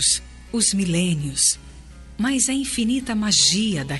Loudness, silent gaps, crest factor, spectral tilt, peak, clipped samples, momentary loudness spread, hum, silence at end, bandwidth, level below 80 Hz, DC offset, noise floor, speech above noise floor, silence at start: -20 LUFS; none; 16 dB; -2.5 dB/octave; -6 dBFS; under 0.1%; 8 LU; none; 0 s; 11.5 kHz; -44 dBFS; under 0.1%; -41 dBFS; 20 dB; 0 s